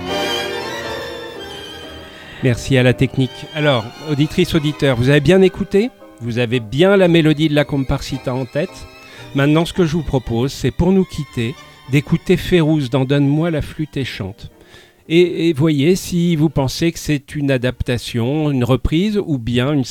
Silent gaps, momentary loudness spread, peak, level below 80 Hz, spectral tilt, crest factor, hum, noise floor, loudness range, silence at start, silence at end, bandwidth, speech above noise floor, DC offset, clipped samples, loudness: none; 13 LU; -2 dBFS; -36 dBFS; -6.5 dB/octave; 16 dB; none; -45 dBFS; 4 LU; 0 s; 0 s; 16.5 kHz; 29 dB; under 0.1%; under 0.1%; -17 LUFS